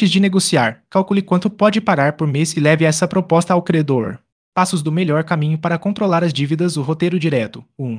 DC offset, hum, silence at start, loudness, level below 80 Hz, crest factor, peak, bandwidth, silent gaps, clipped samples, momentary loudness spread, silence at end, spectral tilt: under 0.1%; none; 0 s; -17 LUFS; -60 dBFS; 16 dB; 0 dBFS; 10.5 kHz; 4.32-4.52 s; under 0.1%; 6 LU; 0 s; -5.5 dB/octave